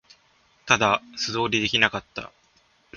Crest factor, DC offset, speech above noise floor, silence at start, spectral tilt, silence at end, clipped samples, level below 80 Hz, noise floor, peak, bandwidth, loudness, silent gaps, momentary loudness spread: 26 dB; under 0.1%; 38 dB; 0.65 s; -3 dB/octave; 0 s; under 0.1%; -56 dBFS; -62 dBFS; 0 dBFS; 7.2 kHz; -22 LUFS; none; 18 LU